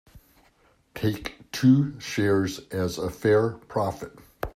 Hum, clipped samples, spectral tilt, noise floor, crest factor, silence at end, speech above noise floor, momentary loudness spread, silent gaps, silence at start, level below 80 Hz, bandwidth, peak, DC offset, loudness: none; under 0.1%; -6.5 dB/octave; -62 dBFS; 18 dB; 0.05 s; 38 dB; 16 LU; none; 0.15 s; -52 dBFS; 15.5 kHz; -8 dBFS; under 0.1%; -25 LUFS